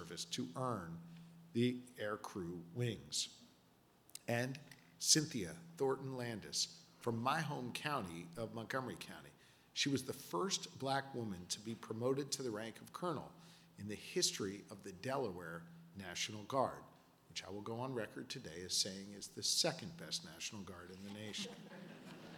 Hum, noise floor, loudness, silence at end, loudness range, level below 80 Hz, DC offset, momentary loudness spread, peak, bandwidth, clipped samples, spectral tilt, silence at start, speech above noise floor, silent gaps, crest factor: none; -70 dBFS; -41 LUFS; 0 s; 5 LU; -76 dBFS; under 0.1%; 16 LU; -16 dBFS; 19 kHz; under 0.1%; -3 dB/octave; 0 s; 28 dB; none; 26 dB